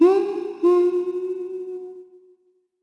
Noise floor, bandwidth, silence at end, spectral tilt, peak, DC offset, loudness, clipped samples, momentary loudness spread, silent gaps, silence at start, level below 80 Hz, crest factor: -63 dBFS; 5.8 kHz; 0.8 s; -6 dB/octave; -6 dBFS; under 0.1%; -22 LUFS; under 0.1%; 17 LU; none; 0 s; -80 dBFS; 16 dB